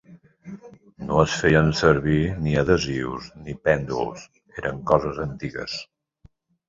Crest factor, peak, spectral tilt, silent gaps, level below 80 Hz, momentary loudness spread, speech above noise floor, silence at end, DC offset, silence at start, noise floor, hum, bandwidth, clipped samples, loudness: 22 dB; -2 dBFS; -6 dB/octave; none; -42 dBFS; 21 LU; 34 dB; 0.85 s; under 0.1%; 0.1 s; -56 dBFS; none; 7.8 kHz; under 0.1%; -23 LUFS